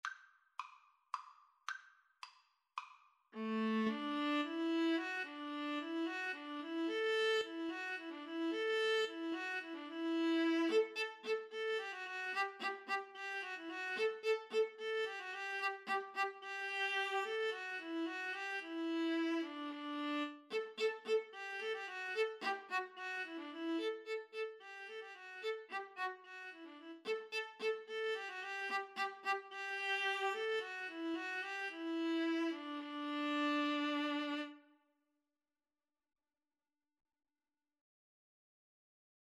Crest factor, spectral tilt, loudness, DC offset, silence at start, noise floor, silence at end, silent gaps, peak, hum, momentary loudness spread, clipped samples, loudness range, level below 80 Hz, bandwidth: 18 dB; -3.5 dB/octave; -40 LUFS; under 0.1%; 0.05 s; under -90 dBFS; 4.65 s; none; -24 dBFS; none; 13 LU; under 0.1%; 6 LU; under -90 dBFS; 12.5 kHz